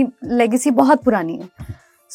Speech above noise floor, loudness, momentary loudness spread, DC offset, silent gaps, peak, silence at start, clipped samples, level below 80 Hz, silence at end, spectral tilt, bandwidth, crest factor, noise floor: 20 dB; -16 LUFS; 21 LU; under 0.1%; none; 0 dBFS; 0 s; under 0.1%; -48 dBFS; 0 s; -5.5 dB/octave; 16 kHz; 18 dB; -37 dBFS